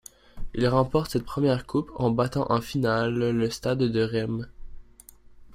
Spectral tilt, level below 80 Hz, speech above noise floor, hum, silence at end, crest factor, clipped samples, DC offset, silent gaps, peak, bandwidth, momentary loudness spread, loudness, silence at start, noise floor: -6.5 dB/octave; -46 dBFS; 26 dB; none; 0 s; 18 dB; under 0.1%; under 0.1%; none; -10 dBFS; 16 kHz; 6 LU; -26 LUFS; 0.35 s; -51 dBFS